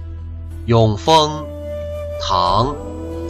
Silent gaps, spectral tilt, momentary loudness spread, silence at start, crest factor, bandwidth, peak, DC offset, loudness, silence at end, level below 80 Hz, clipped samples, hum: none; -5.5 dB/octave; 16 LU; 0 s; 16 dB; 13 kHz; -2 dBFS; under 0.1%; -17 LUFS; 0 s; -34 dBFS; under 0.1%; none